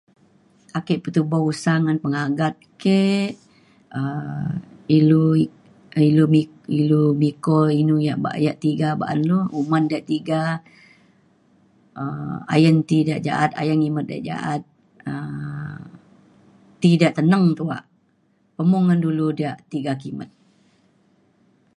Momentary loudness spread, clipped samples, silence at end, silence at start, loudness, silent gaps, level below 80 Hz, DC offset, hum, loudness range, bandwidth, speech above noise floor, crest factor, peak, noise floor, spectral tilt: 14 LU; under 0.1%; 1.5 s; 0.75 s; -20 LUFS; none; -62 dBFS; under 0.1%; none; 6 LU; 11 kHz; 43 dB; 20 dB; -2 dBFS; -63 dBFS; -7.5 dB/octave